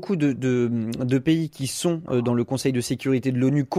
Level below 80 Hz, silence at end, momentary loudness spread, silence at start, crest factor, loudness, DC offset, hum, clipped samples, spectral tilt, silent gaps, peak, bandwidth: -58 dBFS; 0 s; 4 LU; 0 s; 14 dB; -23 LUFS; under 0.1%; none; under 0.1%; -6 dB/octave; none; -10 dBFS; 15 kHz